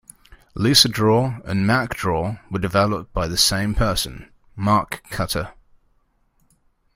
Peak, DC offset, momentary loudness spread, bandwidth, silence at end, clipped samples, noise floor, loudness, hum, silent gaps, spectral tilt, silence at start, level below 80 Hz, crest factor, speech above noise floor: 0 dBFS; under 0.1%; 12 LU; 16 kHz; 1.45 s; under 0.1%; -63 dBFS; -20 LUFS; none; none; -4 dB/octave; 0.3 s; -38 dBFS; 22 dB; 43 dB